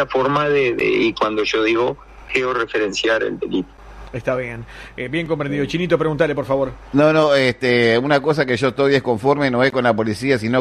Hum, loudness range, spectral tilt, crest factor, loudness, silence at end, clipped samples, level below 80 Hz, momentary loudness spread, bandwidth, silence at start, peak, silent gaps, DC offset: none; 6 LU; -6 dB/octave; 16 dB; -18 LUFS; 0 s; under 0.1%; -46 dBFS; 9 LU; 12.5 kHz; 0 s; -2 dBFS; none; under 0.1%